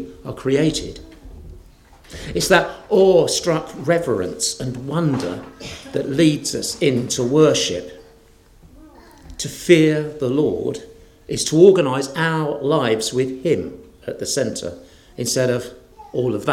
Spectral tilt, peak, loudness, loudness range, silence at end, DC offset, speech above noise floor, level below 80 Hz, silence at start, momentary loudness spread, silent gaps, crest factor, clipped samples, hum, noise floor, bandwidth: -4.5 dB/octave; 0 dBFS; -19 LUFS; 4 LU; 0 s; under 0.1%; 31 dB; -48 dBFS; 0 s; 19 LU; none; 20 dB; under 0.1%; none; -49 dBFS; 16.5 kHz